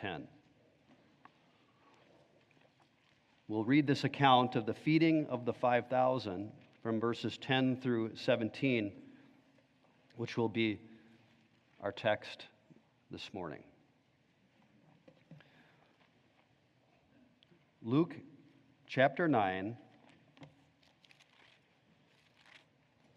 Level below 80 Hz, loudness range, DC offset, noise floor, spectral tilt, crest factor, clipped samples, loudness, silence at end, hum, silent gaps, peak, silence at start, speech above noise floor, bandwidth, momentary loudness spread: -80 dBFS; 18 LU; under 0.1%; -72 dBFS; -7 dB/octave; 26 dB; under 0.1%; -34 LUFS; 2.7 s; none; none; -12 dBFS; 0 s; 39 dB; 9 kHz; 19 LU